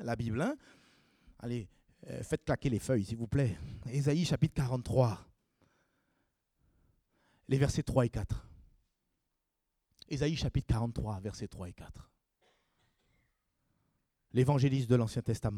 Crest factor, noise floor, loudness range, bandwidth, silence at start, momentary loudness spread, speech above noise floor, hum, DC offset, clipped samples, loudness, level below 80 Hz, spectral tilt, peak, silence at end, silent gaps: 20 dB; -84 dBFS; 6 LU; 13.5 kHz; 0 s; 15 LU; 52 dB; none; under 0.1%; under 0.1%; -33 LUFS; -52 dBFS; -7 dB/octave; -14 dBFS; 0 s; none